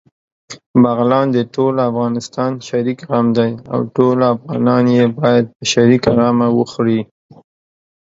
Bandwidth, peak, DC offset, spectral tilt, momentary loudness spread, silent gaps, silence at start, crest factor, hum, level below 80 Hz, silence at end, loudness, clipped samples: 7.8 kHz; 0 dBFS; under 0.1%; -6.5 dB/octave; 8 LU; 0.66-0.74 s, 5.56-5.60 s; 0.5 s; 14 dB; none; -52 dBFS; 1 s; -15 LUFS; under 0.1%